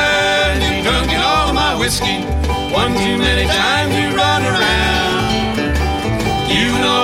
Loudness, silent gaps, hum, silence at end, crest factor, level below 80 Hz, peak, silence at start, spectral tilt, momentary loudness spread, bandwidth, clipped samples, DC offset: -15 LUFS; none; none; 0 s; 14 dB; -24 dBFS; -2 dBFS; 0 s; -4 dB/octave; 4 LU; 16.5 kHz; under 0.1%; under 0.1%